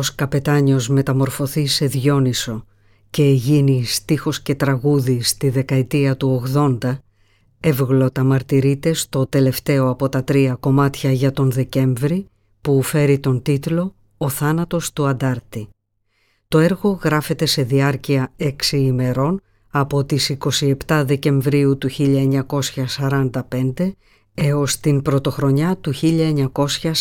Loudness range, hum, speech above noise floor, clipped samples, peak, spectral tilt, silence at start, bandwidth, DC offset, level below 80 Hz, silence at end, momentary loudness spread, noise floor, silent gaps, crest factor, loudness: 2 LU; none; 49 dB; under 0.1%; -2 dBFS; -6 dB/octave; 0 s; 17.5 kHz; under 0.1%; -46 dBFS; 0 s; 6 LU; -66 dBFS; none; 14 dB; -18 LUFS